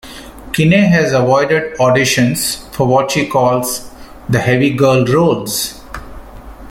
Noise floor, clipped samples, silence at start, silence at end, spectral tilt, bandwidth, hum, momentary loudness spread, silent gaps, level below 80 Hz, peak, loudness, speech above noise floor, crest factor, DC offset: -32 dBFS; under 0.1%; 0.05 s; 0 s; -5 dB/octave; 17 kHz; none; 14 LU; none; -40 dBFS; 0 dBFS; -13 LUFS; 20 dB; 14 dB; under 0.1%